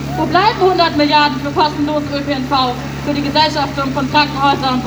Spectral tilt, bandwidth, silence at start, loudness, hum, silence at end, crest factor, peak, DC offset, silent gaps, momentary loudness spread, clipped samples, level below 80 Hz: -5.5 dB/octave; over 20 kHz; 0 s; -14 LUFS; none; 0 s; 14 dB; 0 dBFS; under 0.1%; none; 7 LU; under 0.1%; -38 dBFS